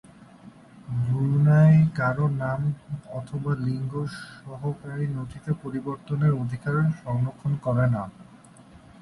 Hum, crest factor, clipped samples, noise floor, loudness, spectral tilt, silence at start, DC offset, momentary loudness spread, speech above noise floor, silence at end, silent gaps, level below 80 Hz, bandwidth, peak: none; 16 dB; under 0.1%; -50 dBFS; -25 LUFS; -9.5 dB/octave; 0.45 s; under 0.1%; 15 LU; 23 dB; 0.8 s; none; -54 dBFS; 11 kHz; -8 dBFS